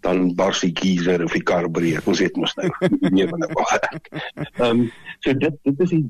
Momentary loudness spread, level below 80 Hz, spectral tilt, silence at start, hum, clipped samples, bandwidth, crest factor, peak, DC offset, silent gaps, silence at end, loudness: 7 LU; -52 dBFS; -5.5 dB/octave; 0.05 s; none; under 0.1%; 13 kHz; 14 dB; -6 dBFS; under 0.1%; none; 0 s; -20 LUFS